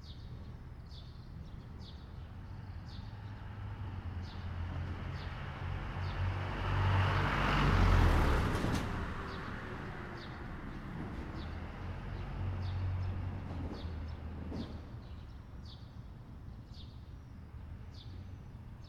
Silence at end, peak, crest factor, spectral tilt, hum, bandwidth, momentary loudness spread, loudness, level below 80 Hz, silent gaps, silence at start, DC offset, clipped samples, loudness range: 0 s; -16 dBFS; 20 dB; -6.5 dB/octave; none; 13 kHz; 19 LU; -38 LUFS; -42 dBFS; none; 0 s; under 0.1%; under 0.1%; 16 LU